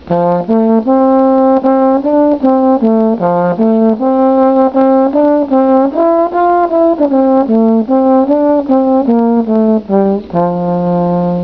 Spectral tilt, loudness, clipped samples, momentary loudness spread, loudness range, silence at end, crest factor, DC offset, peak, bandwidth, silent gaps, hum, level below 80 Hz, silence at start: -11 dB/octave; -10 LUFS; under 0.1%; 3 LU; 1 LU; 0 s; 10 dB; 0.4%; 0 dBFS; 5.4 kHz; none; none; -44 dBFS; 0.05 s